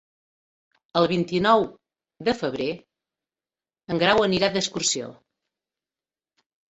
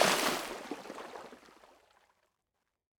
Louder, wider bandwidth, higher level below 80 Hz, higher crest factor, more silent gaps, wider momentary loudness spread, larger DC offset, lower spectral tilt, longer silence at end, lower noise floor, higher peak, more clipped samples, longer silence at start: first, -23 LUFS vs -35 LUFS; second, 8.4 kHz vs over 20 kHz; first, -60 dBFS vs -74 dBFS; second, 22 dB vs 28 dB; neither; second, 11 LU vs 22 LU; neither; first, -3.5 dB/octave vs -1.5 dB/octave; about the same, 1.55 s vs 1.6 s; first, under -90 dBFS vs -85 dBFS; first, -4 dBFS vs -10 dBFS; neither; first, 0.95 s vs 0 s